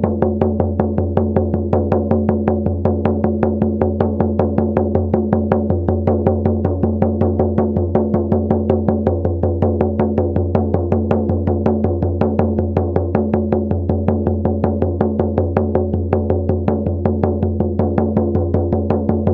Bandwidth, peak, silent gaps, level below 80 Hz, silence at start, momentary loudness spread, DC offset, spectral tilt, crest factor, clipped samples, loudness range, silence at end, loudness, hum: 3.6 kHz; 0 dBFS; none; -32 dBFS; 0 s; 2 LU; under 0.1%; -12.5 dB/octave; 16 dB; under 0.1%; 1 LU; 0 s; -17 LUFS; none